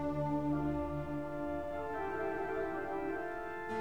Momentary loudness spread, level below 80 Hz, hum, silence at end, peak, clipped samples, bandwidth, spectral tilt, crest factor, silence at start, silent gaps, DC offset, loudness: 5 LU; -54 dBFS; none; 0 s; -24 dBFS; under 0.1%; 19.5 kHz; -8.5 dB/octave; 12 dB; 0 s; none; 0.3%; -38 LUFS